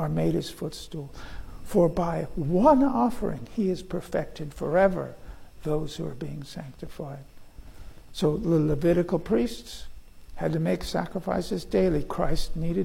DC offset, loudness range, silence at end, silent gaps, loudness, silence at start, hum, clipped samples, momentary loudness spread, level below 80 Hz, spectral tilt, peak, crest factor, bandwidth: under 0.1%; 5 LU; 0 s; none; -27 LUFS; 0 s; none; under 0.1%; 17 LU; -40 dBFS; -7 dB/octave; -8 dBFS; 18 dB; 16.5 kHz